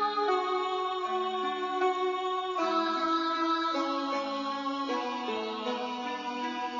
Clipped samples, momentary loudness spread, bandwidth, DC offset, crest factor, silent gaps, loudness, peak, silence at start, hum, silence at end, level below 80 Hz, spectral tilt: under 0.1%; 5 LU; 7.2 kHz; under 0.1%; 14 dB; none; -31 LUFS; -16 dBFS; 0 s; none; 0 s; -80 dBFS; 0 dB/octave